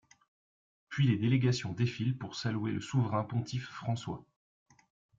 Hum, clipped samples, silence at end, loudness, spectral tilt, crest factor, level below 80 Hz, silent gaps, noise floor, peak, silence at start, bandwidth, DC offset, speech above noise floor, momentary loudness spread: none; under 0.1%; 0.95 s; -33 LUFS; -6.5 dB/octave; 18 dB; -66 dBFS; none; under -90 dBFS; -16 dBFS; 0.9 s; 7.6 kHz; under 0.1%; over 58 dB; 10 LU